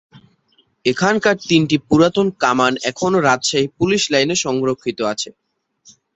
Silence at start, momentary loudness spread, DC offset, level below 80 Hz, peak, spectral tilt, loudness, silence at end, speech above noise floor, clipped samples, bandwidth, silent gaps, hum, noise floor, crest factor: 0.15 s; 7 LU; under 0.1%; -54 dBFS; 0 dBFS; -4 dB/octave; -17 LUFS; 0.85 s; 44 dB; under 0.1%; 8.2 kHz; none; none; -60 dBFS; 18 dB